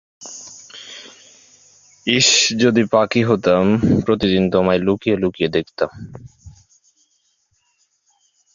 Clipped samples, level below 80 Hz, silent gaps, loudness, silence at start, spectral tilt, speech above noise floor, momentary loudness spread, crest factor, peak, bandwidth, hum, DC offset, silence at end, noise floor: under 0.1%; -46 dBFS; none; -16 LUFS; 0.2 s; -4 dB/octave; 49 dB; 22 LU; 18 dB; 0 dBFS; 7.6 kHz; none; under 0.1%; 2.05 s; -65 dBFS